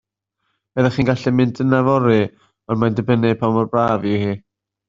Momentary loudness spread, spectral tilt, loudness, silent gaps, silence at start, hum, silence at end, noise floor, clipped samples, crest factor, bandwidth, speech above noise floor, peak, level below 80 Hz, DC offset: 9 LU; -8.5 dB/octave; -18 LUFS; none; 0.75 s; none; 0.5 s; -73 dBFS; under 0.1%; 16 dB; 7.4 kHz; 57 dB; -2 dBFS; -50 dBFS; under 0.1%